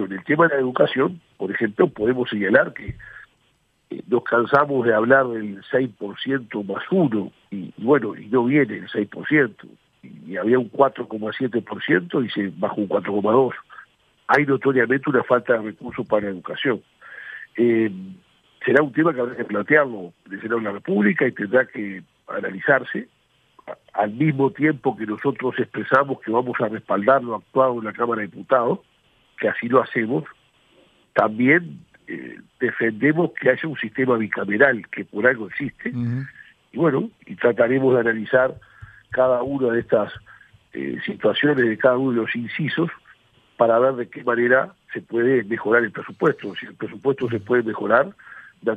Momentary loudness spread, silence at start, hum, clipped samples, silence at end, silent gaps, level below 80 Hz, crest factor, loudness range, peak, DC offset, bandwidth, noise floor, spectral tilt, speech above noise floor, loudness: 14 LU; 0 s; none; under 0.1%; 0 s; none; -62 dBFS; 20 dB; 2 LU; 0 dBFS; under 0.1%; 5.6 kHz; -64 dBFS; -8.5 dB/octave; 44 dB; -21 LUFS